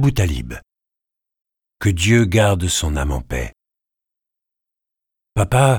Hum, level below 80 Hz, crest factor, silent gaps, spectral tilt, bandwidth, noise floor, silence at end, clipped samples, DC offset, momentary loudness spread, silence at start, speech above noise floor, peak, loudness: none; -32 dBFS; 18 dB; none; -5 dB/octave; 18.5 kHz; -85 dBFS; 0 s; under 0.1%; under 0.1%; 14 LU; 0 s; 68 dB; -2 dBFS; -18 LUFS